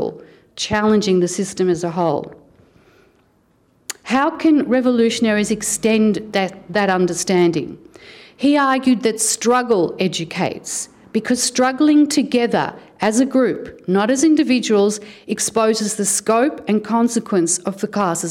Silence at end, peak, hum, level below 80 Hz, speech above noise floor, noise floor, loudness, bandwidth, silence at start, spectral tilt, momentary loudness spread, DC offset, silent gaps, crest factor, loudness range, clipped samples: 0 s; -6 dBFS; none; -56 dBFS; 41 dB; -58 dBFS; -17 LUFS; 16.5 kHz; 0 s; -4 dB/octave; 10 LU; under 0.1%; none; 12 dB; 4 LU; under 0.1%